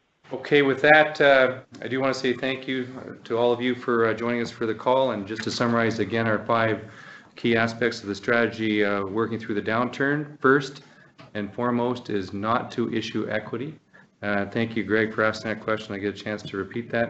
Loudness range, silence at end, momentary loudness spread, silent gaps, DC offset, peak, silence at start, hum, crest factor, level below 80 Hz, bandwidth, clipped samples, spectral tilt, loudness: 6 LU; 0 s; 12 LU; none; under 0.1%; -2 dBFS; 0.3 s; none; 22 dB; -66 dBFS; 8.2 kHz; under 0.1%; -5.5 dB/octave; -24 LUFS